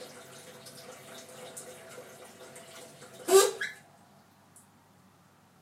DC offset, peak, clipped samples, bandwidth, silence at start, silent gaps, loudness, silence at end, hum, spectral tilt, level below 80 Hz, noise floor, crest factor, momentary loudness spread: under 0.1%; -8 dBFS; under 0.1%; 16 kHz; 0 s; none; -26 LUFS; 1.9 s; none; -2 dB/octave; -86 dBFS; -61 dBFS; 26 dB; 26 LU